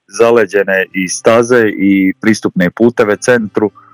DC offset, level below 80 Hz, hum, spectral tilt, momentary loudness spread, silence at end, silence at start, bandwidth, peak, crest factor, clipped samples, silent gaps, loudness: under 0.1%; -54 dBFS; none; -5 dB/octave; 5 LU; 0.25 s; 0.15 s; 18.5 kHz; 0 dBFS; 12 dB; 0.5%; none; -11 LUFS